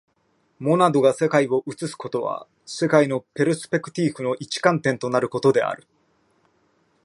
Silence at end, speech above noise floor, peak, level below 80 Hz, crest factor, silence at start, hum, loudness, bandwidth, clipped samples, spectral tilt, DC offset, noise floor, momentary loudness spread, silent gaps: 1.3 s; 45 dB; 0 dBFS; -70 dBFS; 22 dB; 0.6 s; none; -22 LUFS; 11.5 kHz; under 0.1%; -5.5 dB/octave; under 0.1%; -66 dBFS; 11 LU; none